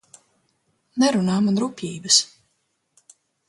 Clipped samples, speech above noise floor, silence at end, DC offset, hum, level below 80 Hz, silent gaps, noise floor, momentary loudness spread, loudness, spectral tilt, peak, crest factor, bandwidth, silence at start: under 0.1%; 51 dB; 1.25 s; under 0.1%; none; -66 dBFS; none; -72 dBFS; 16 LU; -20 LUFS; -3.5 dB/octave; -2 dBFS; 22 dB; 11.5 kHz; 0.95 s